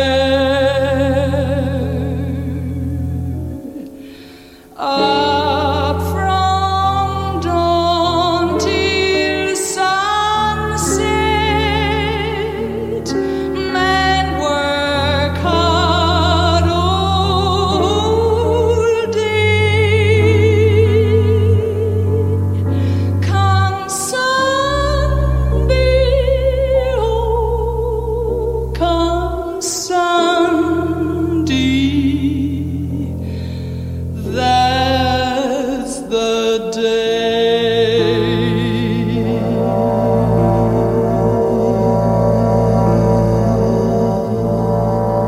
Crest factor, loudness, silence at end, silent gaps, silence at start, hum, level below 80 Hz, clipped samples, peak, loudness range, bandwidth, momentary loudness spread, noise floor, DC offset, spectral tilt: 14 dB; -15 LUFS; 0 s; none; 0 s; none; -28 dBFS; under 0.1%; 0 dBFS; 4 LU; 15.5 kHz; 7 LU; -39 dBFS; under 0.1%; -5.5 dB/octave